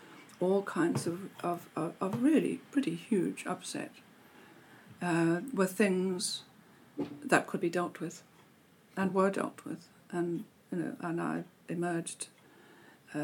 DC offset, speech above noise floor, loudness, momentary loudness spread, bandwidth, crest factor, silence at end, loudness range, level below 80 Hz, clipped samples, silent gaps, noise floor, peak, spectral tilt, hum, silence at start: under 0.1%; 30 dB; -33 LUFS; 14 LU; 18 kHz; 26 dB; 0 s; 4 LU; -84 dBFS; under 0.1%; none; -62 dBFS; -8 dBFS; -5.5 dB/octave; none; 0 s